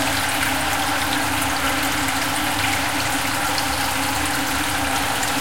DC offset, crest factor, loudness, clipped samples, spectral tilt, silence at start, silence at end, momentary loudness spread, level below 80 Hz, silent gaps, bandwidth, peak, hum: 2%; 16 dB; -20 LUFS; under 0.1%; -2 dB/octave; 0 s; 0 s; 1 LU; -40 dBFS; none; 17 kHz; -6 dBFS; none